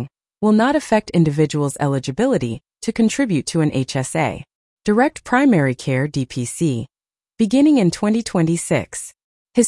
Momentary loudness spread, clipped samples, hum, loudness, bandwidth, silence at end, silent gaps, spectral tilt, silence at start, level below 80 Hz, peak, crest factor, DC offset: 12 LU; under 0.1%; none; -18 LUFS; 12 kHz; 0 s; 4.55-4.77 s, 9.23-9.45 s; -6 dB/octave; 0 s; -52 dBFS; -2 dBFS; 16 dB; under 0.1%